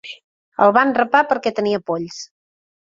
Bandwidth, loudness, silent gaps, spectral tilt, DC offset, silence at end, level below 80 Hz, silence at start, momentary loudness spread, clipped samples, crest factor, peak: 7.8 kHz; -17 LUFS; 0.24-0.52 s; -5 dB/octave; under 0.1%; 0.65 s; -64 dBFS; 0.05 s; 20 LU; under 0.1%; 18 dB; 0 dBFS